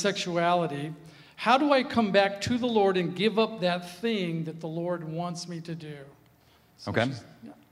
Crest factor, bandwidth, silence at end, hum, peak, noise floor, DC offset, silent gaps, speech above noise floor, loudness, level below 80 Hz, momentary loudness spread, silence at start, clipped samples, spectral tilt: 22 dB; 15 kHz; 0.2 s; none; -8 dBFS; -61 dBFS; under 0.1%; none; 33 dB; -27 LUFS; -66 dBFS; 15 LU; 0 s; under 0.1%; -5.5 dB/octave